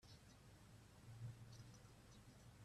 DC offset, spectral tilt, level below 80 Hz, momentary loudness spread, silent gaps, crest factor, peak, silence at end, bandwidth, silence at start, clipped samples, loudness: under 0.1%; -5 dB/octave; -74 dBFS; 8 LU; none; 18 dB; -44 dBFS; 0 s; 14 kHz; 0 s; under 0.1%; -62 LUFS